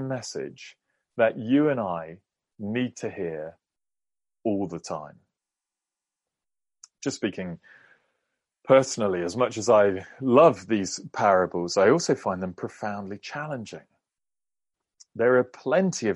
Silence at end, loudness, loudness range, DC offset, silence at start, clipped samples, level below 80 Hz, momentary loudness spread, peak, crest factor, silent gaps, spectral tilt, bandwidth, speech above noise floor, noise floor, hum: 0 s; -25 LUFS; 14 LU; under 0.1%; 0 s; under 0.1%; -70 dBFS; 17 LU; -4 dBFS; 22 dB; none; -5 dB/octave; 11.5 kHz; over 66 dB; under -90 dBFS; none